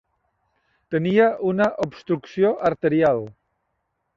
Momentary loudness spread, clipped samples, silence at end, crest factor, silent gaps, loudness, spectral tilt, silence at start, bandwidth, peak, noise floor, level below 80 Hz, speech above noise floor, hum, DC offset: 9 LU; under 0.1%; 0.85 s; 18 dB; none; -21 LUFS; -8 dB/octave; 0.9 s; 7.4 kHz; -4 dBFS; -75 dBFS; -60 dBFS; 54 dB; none; under 0.1%